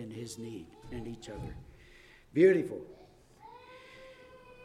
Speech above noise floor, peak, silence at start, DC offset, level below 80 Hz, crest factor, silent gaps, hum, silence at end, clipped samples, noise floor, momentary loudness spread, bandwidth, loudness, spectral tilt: 26 dB; -14 dBFS; 0 s; under 0.1%; -58 dBFS; 22 dB; none; none; 0 s; under 0.1%; -57 dBFS; 28 LU; 12 kHz; -32 LUFS; -6.5 dB/octave